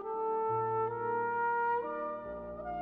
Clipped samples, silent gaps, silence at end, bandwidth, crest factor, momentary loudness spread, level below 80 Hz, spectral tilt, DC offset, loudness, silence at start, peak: under 0.1%; none; 0 s; 4 kHz; 10 dB; 10 LU; -62 dBFS; -9.5 dB/octave; under 0.1%; -34 LUFS; 0 s; -24 dBFS